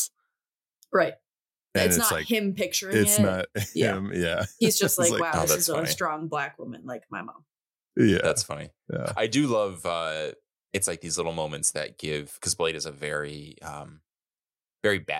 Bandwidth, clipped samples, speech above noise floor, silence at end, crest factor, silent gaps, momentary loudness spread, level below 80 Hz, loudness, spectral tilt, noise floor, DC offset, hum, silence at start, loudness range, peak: 17 kHz; under 0.1%; over 64 dB; 0 s; 18 dB; none; 16 LU; -56 dBFS; -26 LUFS; -3.5 dB/octave; under -90 dBFS; under 0.1%; none; 0 s; 6 LU; -8 dBFS